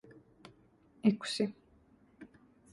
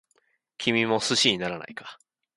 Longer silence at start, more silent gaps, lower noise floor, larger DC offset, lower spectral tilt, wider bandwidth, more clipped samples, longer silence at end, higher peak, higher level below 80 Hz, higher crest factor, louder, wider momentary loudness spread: second, 0.45 s vs 0.6 s; neither; second, -65 dBFS vs -70 dBFS; neither; first, -5.5 dB/octave vs -3 dB/octave; about the same, 11.5 kHz vs 11.5 kHz; neither; about the same, 0.45 s vs 0.45 s; second, -16 dBFS vs -6 dBFS; second, -74 dBFS vs -66 dBFS; about the same, 24 dB vs 22 dB; second, -34 LUFS vs -24 LUFS; first, 26 LU vs 19 LU